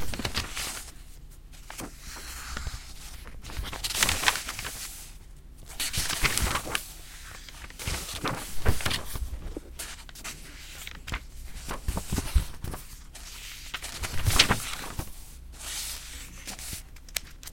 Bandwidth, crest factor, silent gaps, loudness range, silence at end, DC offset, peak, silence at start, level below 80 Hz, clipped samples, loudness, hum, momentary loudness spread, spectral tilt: 17 kHz; 30 dB; none; 7 LU; 0 s; under 0.1%; -2 dBFS; 0 s; -38 dBFS; under 0.1%; -31 LUFS; none; 18 LU; -2 dB/octave